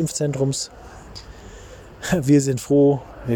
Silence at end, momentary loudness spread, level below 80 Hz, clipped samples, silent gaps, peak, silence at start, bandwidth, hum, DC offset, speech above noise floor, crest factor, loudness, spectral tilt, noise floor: 0 s; 24 LU; -46 dBFS; under 0.1%; none; -4 dBFS; 0 s; 17.5 kHz; none; under 0.1%; 21 dB; 16 dB; -20 LUFS; -6 dB/octave; -41 dBFS